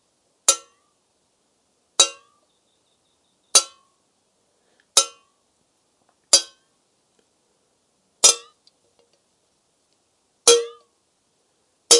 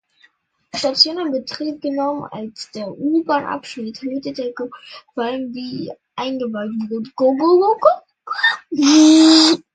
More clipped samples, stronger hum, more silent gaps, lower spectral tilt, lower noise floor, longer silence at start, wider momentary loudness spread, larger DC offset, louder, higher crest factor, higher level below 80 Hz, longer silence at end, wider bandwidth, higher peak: neither; neither; neither; second, 2.5 dB/octave vs -3 dB/octave; first, -68 dBFS vs -57 dBFS; second, 0.5 s vs 0.75 s; second, 13 LU vs 19 LU; neither; about the same, -18 LUFS vs -17 LUFS; first, 26 dB vs 18 dB; second, -84 dBFS vs -64 dBFS; second, 0 s vs 0.15 s; first, 11.5 kHz vs 9.4 kHz; about the same, 0 dBFS vs 0 dBFS